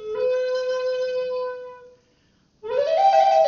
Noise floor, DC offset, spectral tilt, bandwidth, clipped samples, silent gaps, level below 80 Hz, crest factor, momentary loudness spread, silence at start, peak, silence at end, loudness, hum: -62 dBFS; under 0.1%; 1 dB/octave; 7.2 kHz; under 0.1%; none; -66 dBFS; 16 dB; 18 LU; 0 s; -6 dBFS; 0 s; -22 LUFS; none